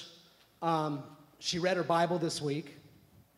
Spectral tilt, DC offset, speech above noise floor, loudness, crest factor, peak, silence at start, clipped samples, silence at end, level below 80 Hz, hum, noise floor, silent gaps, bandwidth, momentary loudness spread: -4.5 dB/octave; under 0.1%; 29 dB; -33 LUFS; 18 dB; -16 dBFS; 0 s; under 0.1%; 0.5 s; -72 dBFS; none; -61 dBFS; none; 15.5 kHz; 18 LU